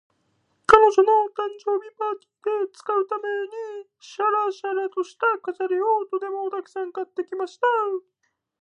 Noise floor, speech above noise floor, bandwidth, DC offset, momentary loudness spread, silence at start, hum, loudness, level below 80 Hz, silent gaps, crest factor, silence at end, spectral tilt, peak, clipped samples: -69 dBFS; 46 dB; 10 kHz; under 0.1%; 14 LU; 0.7 s; none; -23 LUFS; -58 dBFS; none; 24 dB; 0.65 s; -4 dB/octave; 0 dBFS; under 0.1%